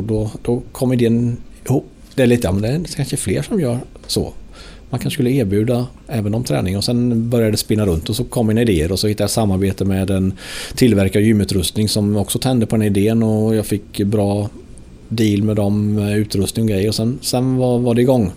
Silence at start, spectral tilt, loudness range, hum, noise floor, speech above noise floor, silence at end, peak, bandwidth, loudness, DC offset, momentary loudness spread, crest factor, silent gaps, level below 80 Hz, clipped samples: 0 s; -6 dB/octave; 4 LU; none; -37 dBFS; 20 dB; 0 s; -2 dBFS; 16 kHz; -17 LUFS; under 0.1%; 7 LU; 16 dB; none; -38 dBFS; under 0.1%